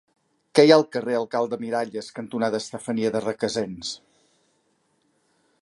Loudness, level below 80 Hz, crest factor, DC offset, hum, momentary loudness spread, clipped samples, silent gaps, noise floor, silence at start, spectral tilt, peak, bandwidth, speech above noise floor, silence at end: -23 LUFS; -68 dBFS; 22 dB; under 0.1%; none; 16 LU; under 0.1%; none; -68 dBFS; 0.55 s; -5 dB/octave; -2 dBFS; 11.5 kHz; 46 dB; 1.65 s